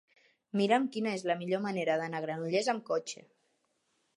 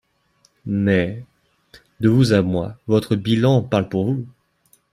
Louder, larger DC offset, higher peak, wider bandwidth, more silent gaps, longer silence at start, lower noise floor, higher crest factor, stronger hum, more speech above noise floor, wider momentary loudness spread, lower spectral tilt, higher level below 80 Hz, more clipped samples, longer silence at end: second, -32 LUFS vs -19 LUFS; neither; second, -14 dBFS vs -4 dBFS; second, 11.5 kHz vs 14 kHz; neither; about the same, 0.55 s vs 0.65 s; first, -77 dBFS vs -61 dBFS; about the same, 20 dB vs 18 dB; neither; about the same, 45 dB vs 43 dB; second, 8 LU vs 11 LU; second, -5 dB/octave vs -7.5 dB/octave; second, -86 dBFS vs -52 dBFS; neither; first, 1.05 s vs 0.65 s